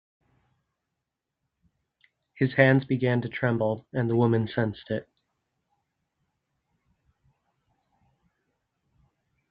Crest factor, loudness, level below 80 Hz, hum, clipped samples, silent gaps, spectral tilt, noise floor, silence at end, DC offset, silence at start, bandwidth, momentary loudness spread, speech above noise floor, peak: 26 dB; -25 LUFS; -66 dBFS; none; under 0.1%; none; -10 dB/octave; -85 dBFS; 4.5 s; under 0.1%; 2.35 s; 5 kHz; 10 LU; 60 dB; -4 dBFS